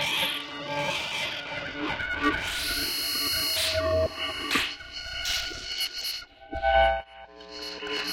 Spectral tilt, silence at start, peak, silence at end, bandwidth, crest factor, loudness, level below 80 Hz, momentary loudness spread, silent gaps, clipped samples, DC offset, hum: -2 dB/octave; 0 s; -10 dBFS; 0 s; 16.5 kHz; 18 dB; -27 LUFS; -46 dBFS; 11 LU; none; under 0.1%; under 0.1%; none